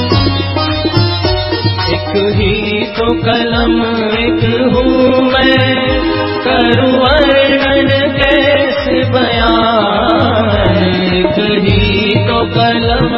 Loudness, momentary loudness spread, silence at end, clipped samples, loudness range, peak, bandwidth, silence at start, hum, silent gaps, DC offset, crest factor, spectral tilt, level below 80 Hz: -11 LUFS; 5 LU; 0 s; under 0.1%; 3 LU; 0 dBFS; 5.8 kHz; 0 s; none; none; 0.3%; 10 dB; -8.5 dB/octave; -24 dBFS